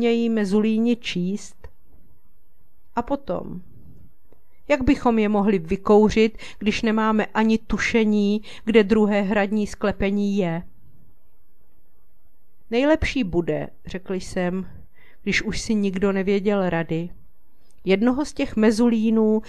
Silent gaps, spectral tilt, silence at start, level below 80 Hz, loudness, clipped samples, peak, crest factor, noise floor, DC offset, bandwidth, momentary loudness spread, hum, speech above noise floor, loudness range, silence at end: none; -6 dB/octave; 0 s; -42 dBFS; -22 LUFS; under 0.1%; -2 dBFS; 20 dB; -62 dBFS; 2%; 11 kHz; 12 LU; none; 41 dB; 8 LU; 0 s